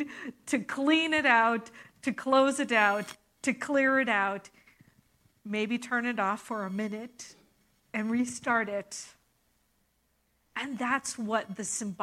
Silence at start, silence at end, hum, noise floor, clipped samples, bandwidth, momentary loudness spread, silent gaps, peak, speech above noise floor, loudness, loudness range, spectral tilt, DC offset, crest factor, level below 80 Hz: 0 s; 0 s; none; -73 dBFS; under 0.1%; 15 kHz; 17 LU; none; -8 dBFS; 44 dB; -29 LUFS; 8 LU; -3.5 dB/octave; under 0.1%; 22 dB; -74 dBFS